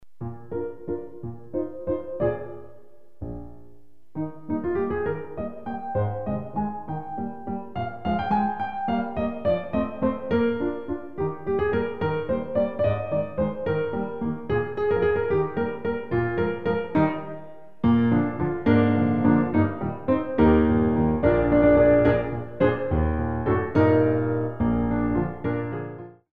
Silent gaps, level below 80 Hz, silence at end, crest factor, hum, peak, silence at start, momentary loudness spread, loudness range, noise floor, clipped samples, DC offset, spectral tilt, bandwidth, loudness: none; -40 dBFS; 0 s; 18 dB; none; -6 dBFS; 0 s; 14 LU; 11 LU; -56 dBFS; under 0.1%; 0.9%; -10.5 dB/octave; 4.9 kHz; -25 LUFS